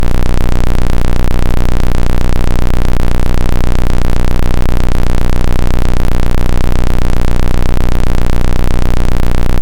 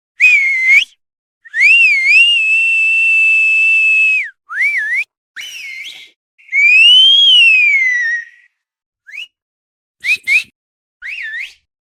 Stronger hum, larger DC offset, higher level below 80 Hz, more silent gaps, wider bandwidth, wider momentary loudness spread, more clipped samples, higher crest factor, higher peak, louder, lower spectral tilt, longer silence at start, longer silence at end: neither; neither; first, -10 dBFS vs -68 dBFS; second, none vs 1.18-1.41 s, 5.17-5.34 s, 6.16-6.38 s, 8.86-8.93 s, 9.42-9.94 s, 10.55-11.00 s; second, 7.4 kHz vs 15 kHz; second, 0 LU vs 22 LU; neither; second, 4 dB vs 12 dB; about the same, 0 dBFS vs 0 dBFS; second, -16 LUFS vs -8 LUFS; first, -6.5 dB/octave vs 5.5 dB/octave; second, 0 s vs 0.2 s; second, 0 s vs 0.3 s